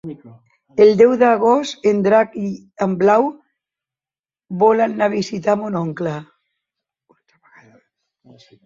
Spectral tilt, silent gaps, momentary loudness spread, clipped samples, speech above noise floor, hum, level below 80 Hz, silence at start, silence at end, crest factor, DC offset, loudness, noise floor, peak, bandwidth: -6.5 dB/octave; 4.20-4.24 s; 14 LU; under 0.1%; over 74 dB; none; -62 dBFS; 0.05 s; 2.4 s; 16 dB; under 0.1%; -16 LUFS; under -90 dBFS; -2 dBFS; 7.6 kHz